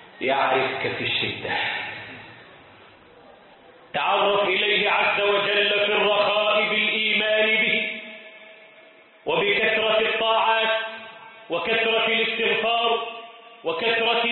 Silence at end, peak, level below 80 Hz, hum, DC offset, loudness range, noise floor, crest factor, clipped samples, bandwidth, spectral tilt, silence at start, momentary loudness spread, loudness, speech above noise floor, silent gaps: 0 s; -8 dBFS; -64 dBFS; none; under 0.1%; 7 LU; -51 dBFS; 16 dB; under 0.1%; 4.3 kHz; -7.5 dB/octave; 0 s; 14 LU; -21 LUFS; 28 dB; none